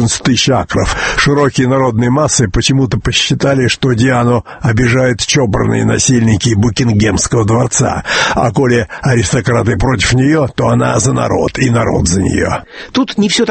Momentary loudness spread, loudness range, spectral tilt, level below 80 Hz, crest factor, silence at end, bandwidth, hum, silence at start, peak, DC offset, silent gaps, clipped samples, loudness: 3 LU; 1 LU; -4.5 dB/octave; -30 dBFS; 12 dB; 0 s; 8.8 kHz; none; 0 s; 0 dBFS; under 0.1%; none; under 0.1%; -11 LUFS